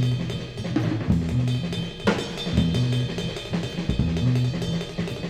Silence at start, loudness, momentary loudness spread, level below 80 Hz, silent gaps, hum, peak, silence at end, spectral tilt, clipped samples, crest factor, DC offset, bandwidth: 0 s; -25 LUFS; 6 LU; -38 dBFS; none; none; -8 dBFS; 0 s; -6.5 dB/octave; under 0.1%; 16 dB; under 0.1%; 12 kHz